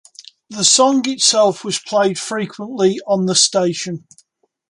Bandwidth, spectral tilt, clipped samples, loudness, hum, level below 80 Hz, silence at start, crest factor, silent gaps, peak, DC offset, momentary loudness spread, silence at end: 11.5 kHz; -2.5 dB/octave; under 0.1%; -15 LUFS; none; -66 dBFS; 0.5 s; 18 dB; none; 0 dBFS; under 0.1%; 13 LU; 0.75 s